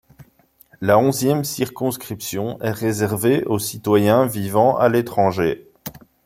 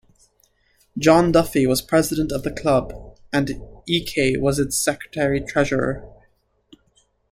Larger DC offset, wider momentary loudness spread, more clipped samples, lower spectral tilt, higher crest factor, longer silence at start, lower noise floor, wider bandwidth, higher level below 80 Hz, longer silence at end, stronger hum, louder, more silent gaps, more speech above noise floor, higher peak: neither; about the same, 11 LU vs 11 LU; neither; about the same, -5.5 dB/octave vs -5 dB/octave; about the same, 18 dB vs 20 dB; second, 0.2 s vs 0.95 s; second, -55 dBFS vs -63 dBFS; about the same, 16.5 kHz vs 16.5 kHz; second, -56 dBFS vs -42 dBFS; second, 0.35 s vs 1.2 s; neither; about the same, -19 LUFS vs -20 LUFS; neither; second, 37 dB vs 43 dB; about the same, -2 dBFS vs -2 dBFS